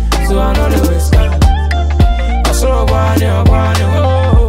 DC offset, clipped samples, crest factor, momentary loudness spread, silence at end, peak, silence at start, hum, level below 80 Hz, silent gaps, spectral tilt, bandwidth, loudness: under 0.1%; under 0.1%; 10 dB; 3 LU; 0 s; 0 dBFS; 0 s; none; -12 dBFS; none; -6 dB/octave; 16 kHz; -12 LUFS